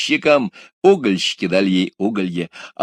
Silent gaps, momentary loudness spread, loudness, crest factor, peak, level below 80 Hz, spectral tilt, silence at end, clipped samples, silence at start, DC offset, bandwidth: 0.73-0.82 s; 11 LU; -17 LUFS; 18 dB; 0 dBFS; -62 dBFS; -5 dB/octave; 0 s; under 0.1%; 0 s; under 0.1%; 10.5 kHz